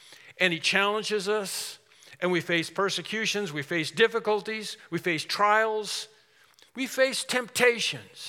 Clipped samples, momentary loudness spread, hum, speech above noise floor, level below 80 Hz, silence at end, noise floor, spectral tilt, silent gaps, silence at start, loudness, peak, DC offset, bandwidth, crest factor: under 0.1%; 11 LU; none; 33 dB; -84 dBFS; 0 s; -60 dBFS; -3 dB/octave; none; 0.1 s; -26 LUFS; -6 dBFS; under 0.1%; 17 kHz; 22 dB